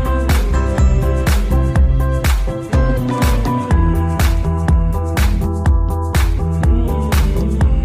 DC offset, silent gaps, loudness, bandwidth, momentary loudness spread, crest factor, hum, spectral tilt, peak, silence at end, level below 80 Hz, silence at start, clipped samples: under 0.1%; none; -16 LUFS; 15.5 kHz; 3 LU; 10 dB; none; -6.5 dB/octave; -4 dBFS; 0 s; -16 dBFS; 0 s; under 0.1%